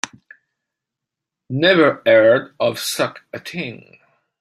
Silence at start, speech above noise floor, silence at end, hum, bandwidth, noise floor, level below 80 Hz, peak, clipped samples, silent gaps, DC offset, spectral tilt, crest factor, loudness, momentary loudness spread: 0.05 s; 67 dB; 0.65 s; none; 15.5 kHz; -84 dBFS; -64 dBFS; -2 dBFS; under 0.1%; none; under 0.1%; -4.5 dB/octave; 18 dB; -16 LUFS; 17 LU